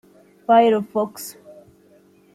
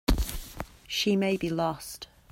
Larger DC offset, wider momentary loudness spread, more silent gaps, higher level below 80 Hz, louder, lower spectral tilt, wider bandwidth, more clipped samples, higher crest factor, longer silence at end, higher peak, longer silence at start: neither; first, 20 LU vs 16 LU; neither; second, -70 dBFS vs -36 dBFS; first, -18 LUFS vs -29 LUFS; about the same, -5 dB/octave vs -4.5 dB/octave; about the same, 15 kHz vs 16 kHz; neither; about the same, 18 dB vs 20 dB; first, 1.05 s vs 0.25 s; first, -4 dBFS vs -8 dBFS; first, 0.5 s vs 0.1 s